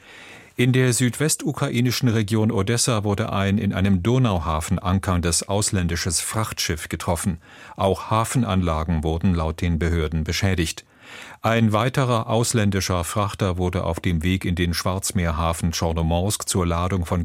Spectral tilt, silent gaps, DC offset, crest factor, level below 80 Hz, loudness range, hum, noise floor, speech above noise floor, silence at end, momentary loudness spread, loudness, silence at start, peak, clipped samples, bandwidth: -5 dB/octave; none; under 0.1%; 18 dB; -36 dBFS; 2 LU; none; -44 dBFS; 22 dB; 0 s; 5 LU; -22 LUFS; 0.1 s; -4 dBFS; under 0.1%; 16.5 kHz